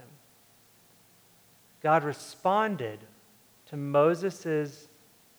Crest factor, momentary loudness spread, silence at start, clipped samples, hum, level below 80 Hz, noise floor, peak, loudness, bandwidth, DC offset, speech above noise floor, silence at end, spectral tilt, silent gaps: 20 dB; 14 LU; 1.85 s; under 0.1%; none; -82 dBFS; -61 dBFS; -10 dBFS; -28 LUFS; over 20 kHz; under 0.1%; 33 dB; 0.65 s; -6 dB/octave; none